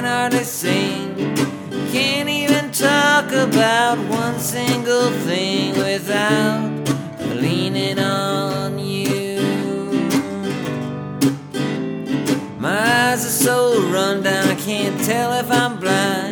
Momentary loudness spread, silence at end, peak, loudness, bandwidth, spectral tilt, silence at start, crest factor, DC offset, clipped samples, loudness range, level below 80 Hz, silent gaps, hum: 8 LU; 0 s; -2 dBFS; -19 LUFS; over 20 kHz; -4 dB/octave; 0 s; 18 dB; under 0.1%; under 0.1%; 5 LU; -62 dBFS; none; none